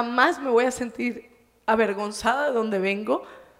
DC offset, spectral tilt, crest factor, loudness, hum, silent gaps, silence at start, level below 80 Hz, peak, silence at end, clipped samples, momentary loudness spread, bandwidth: under 0.1%; -4 dB/octave; 20 dB; -24 LUFS; none; none; 0 s; -58 dBFS; -4 dBFS; 0.15 s; under 0.1%; 9 LU; 15.5 kHz